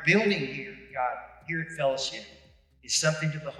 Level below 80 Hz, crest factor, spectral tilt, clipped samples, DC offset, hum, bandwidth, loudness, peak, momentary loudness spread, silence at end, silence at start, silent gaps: -62 dBFS; 22 dB; -3.5 dB/octave; under 0.1%; under 0.1%; none; 12.5 kHz; -28 LUFS; -8 dBFS; 15 LU; 0 s; 0 s; none